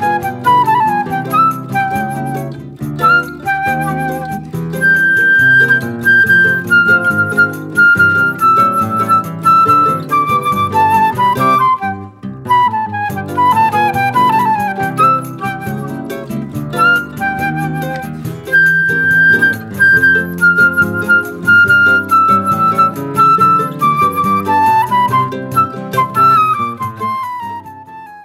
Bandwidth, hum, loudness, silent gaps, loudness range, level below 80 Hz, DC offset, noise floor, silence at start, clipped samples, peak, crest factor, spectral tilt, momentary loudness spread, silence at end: 16 kHz; none; -11 LUFS; none; 6 LU; -48 dBFS; under 0.1%; -32 dBFS; 0 s; under 0.1%; 0 dBFS; 12 dB; -5.5 dB/octave; 13 LU; 0 s